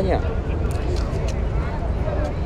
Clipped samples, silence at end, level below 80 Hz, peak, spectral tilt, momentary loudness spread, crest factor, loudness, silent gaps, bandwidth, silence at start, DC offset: under 0.1%; 0 s; -26 dBFS; -6 dBFS; -7.5 dB/octave; 2 LU; 16 dB; -24 LUFS; none; 10.5 kHz; 0 s; under 0.1%